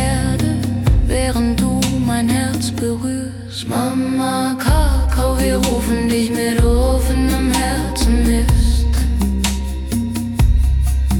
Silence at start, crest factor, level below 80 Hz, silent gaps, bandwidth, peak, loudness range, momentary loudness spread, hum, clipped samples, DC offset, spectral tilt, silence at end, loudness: 0 s; 12 dB; -18 dBFS; none; 18 kHz; -4 dBFS; 2 LU; 5 LU; none; under 0.1%; under 0.1%; -5.5 dB/octave; 0 s; -17 LUFS